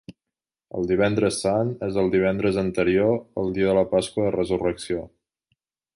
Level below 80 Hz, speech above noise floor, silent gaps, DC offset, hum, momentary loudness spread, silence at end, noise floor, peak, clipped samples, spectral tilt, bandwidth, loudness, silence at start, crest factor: -50 dBFS; 66 dB; none; under 0.1%; none; 8 LU; 0.9 s; -88 dBFS; -8 dBFS; under 0.1%; -6 dB/octave; 11.5 kHz; -23 LUFS; 0.1 s; 16 dB